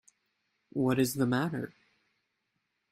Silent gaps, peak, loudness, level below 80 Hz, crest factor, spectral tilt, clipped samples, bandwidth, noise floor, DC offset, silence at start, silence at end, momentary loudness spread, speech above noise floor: none; -14 dBFS; -31 LUFS; -70 dBFS; 20 dB; -6 dB/octave; under 0.1%; 16 kHz; -81 dBFS; under 0.1%; 0.75 s; 1.2 s; 12 LU; 52 dB